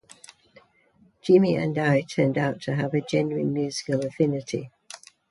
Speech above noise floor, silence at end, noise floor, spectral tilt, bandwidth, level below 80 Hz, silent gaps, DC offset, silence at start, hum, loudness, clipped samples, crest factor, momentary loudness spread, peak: 37 dB; 0.35 s; -61 dBFS; -6.5 dB/octave; 11.5 kHz; -64 dBFS; none; under 0.1%; 1.25 s; none; -24 LUFS; under 0.1%; 18 dB; 15 LU; -6 dBFS